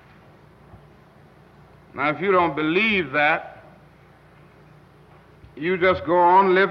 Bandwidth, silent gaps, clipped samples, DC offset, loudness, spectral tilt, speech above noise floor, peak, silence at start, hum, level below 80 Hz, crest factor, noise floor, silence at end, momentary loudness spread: 6 kHz; none; under 0.1%; under 0.1%; -19 LUFS; -7.5 dB/octave; 32 dB; -6 dBFS; 1.95 s; 60 Hz at -60 dBFS; -56 dBFS; 16 dB; -51 dBFS; 0 s; 11 LU